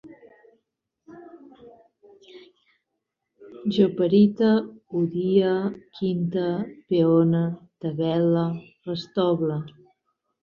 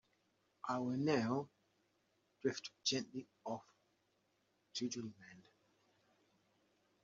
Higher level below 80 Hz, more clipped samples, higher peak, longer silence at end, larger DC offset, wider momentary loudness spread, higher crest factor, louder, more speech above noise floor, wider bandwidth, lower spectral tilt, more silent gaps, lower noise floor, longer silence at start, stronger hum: first, -66 dBFS vs -84 dBFS; neither; first, -6 dBFS vs -22 dBFS; second, 0.75 s vs 1.65 s; neither; about the same, 13 LU vs 15 LU; second, 18 dB vs 24 dB; first, -23 LUFS vs -42 LUFS; first, 59 dB vs 40 dB; second, 6.6 kHz vs 7.4 kHz; first, -9.5 dB/octave vs -4 dB/octave; neither; about the same, -81 dBFS vs -81 dBFS; second, 0.05 s vs 0.65 s; neither